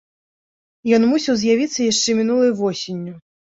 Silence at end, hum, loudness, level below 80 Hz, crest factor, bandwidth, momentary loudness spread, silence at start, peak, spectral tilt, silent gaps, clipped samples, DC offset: 0.3 s; none; -18 LUFS; -62 dBFS; 16 dB; 7.8 kHz; 12 LU; 0.85 s; -4 dBFS; -4 dB/octave; none; under 0.1%; under 0.1%